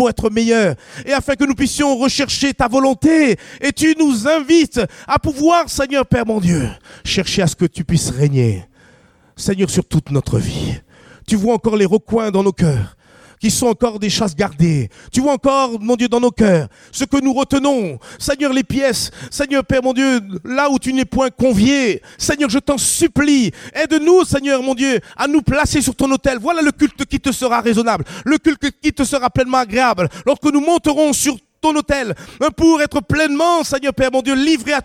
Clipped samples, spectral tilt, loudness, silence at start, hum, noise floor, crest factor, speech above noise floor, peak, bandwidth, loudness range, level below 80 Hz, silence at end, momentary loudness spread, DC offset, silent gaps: under 0.1%; -5 dB/octave; -16 LUFS; 0 s; none; -50 dBFS; 16 dB; 35 dB; 0 dBFS; 16 kHz; 3 LU; -38 dBFS; 0 s; 7 LU; under 0.1%; none